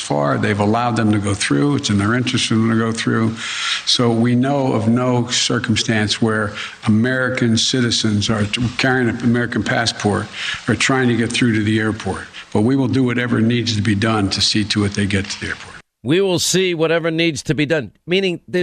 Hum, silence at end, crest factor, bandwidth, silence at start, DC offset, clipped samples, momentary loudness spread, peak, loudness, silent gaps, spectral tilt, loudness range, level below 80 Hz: none; 0 s; 14 dB; 14 kHz; 0 s; under 0.1%; under 0.1%; 6 LU; -4 dBFS; -17 LUFS; none; -4.5 dB/octave; 1 LU; -48 dBFS